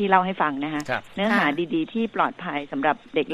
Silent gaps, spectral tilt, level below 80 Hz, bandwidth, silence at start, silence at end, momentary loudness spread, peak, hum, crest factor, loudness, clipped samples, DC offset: none; -6 dB/octave; -62 dBFS; 13 kHz; 0 s; 0 s; 8 LU; -2 dBFS; none; 22 dB; -24 LUFS; under 0.1%; under 0.1%